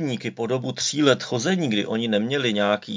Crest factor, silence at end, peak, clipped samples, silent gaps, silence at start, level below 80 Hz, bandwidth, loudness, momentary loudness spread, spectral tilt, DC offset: 20 dB; 0 s; -4 dBFS; under 0.1%; none; 0 s; -68 dBFS; 7.6 kHz; -23 LUFS; 6 LU; -4.5 dB/octave; under 0.1%